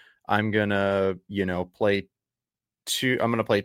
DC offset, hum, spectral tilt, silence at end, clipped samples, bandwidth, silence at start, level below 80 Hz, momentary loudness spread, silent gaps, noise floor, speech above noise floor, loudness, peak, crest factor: under 0.1%; none; -5 dB/octave; 0 s; under 0.1%; 16.5 kHz; 0.3 s; -62 dBFS; 6 LU; none; under -90 dBFS; over 65 dB; -25 LUFS; -6 dBFS; 20 dB